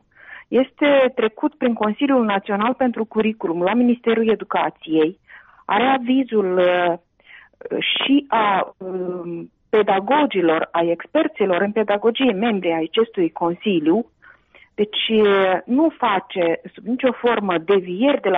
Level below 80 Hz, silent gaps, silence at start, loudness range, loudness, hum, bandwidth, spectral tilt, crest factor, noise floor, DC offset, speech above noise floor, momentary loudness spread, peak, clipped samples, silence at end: -62 dBFS; none; 0.3 s; 2 LU; -19 LUFS; none; 4.5 kHz; -3 dB/octave; 12 dB; -51 dBFS; under 0.1%; 32 dB; 6 LU; -6 dBFS; under 0.1%; 0 s